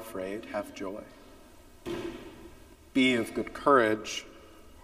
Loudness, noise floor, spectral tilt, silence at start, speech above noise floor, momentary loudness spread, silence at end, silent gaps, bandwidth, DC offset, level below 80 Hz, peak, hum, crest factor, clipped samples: -29 LUFS; -53 dBFS; -4 dB/octave; 0 s; 24 dB; 23 LU; 0 s; none; 15.5 kHz; under 0.1%; -58 dBFS; -8 dBFS; none; 22 dB; under 0.1%